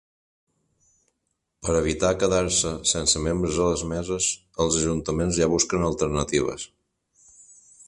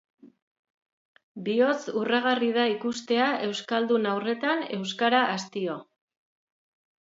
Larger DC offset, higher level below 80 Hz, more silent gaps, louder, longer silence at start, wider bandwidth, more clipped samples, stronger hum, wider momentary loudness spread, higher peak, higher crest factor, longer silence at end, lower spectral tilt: neither; first, -42 dBFS vs -80 dBFS; second, none vs 0.42-1.15 s, 1.23-1.35 s; first, -23 LUFS vs -26 LUFS; first, 1.6 s vs 0.25 s; first, 11.5 kHz vs 7.8 kHz; neither; neither; about the same, 6 LU vs 8 LU; about the same, -6 dBFS vs -8 dBFS; about the same, 20 dB vs 20 dB; second, 0.05 s vs 1.15 s; about the same, -3.5 dB/octave vs -4.5 dB/octave